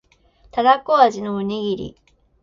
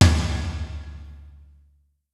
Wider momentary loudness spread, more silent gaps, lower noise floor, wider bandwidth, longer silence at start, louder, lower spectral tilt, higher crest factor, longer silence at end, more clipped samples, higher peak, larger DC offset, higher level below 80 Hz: second, 13 LU vs 22 LU; neither; second, -55 dBFS vs -61 dBFS; second, 7.4 kHz vs 12 kHz; first, 0.55 s vs 0 s; first, -19 LUFS vs -25 LUFS; about the same, -5.5 dB/octave vs -5 dB/octave; about the same, 20 dB vs 22 dB; second, 0.5 s vs 0.85 s; neither; about the same, -2 dBFS vs -2 dBFS; neither; second, -54 dBFS vs -30 dBFS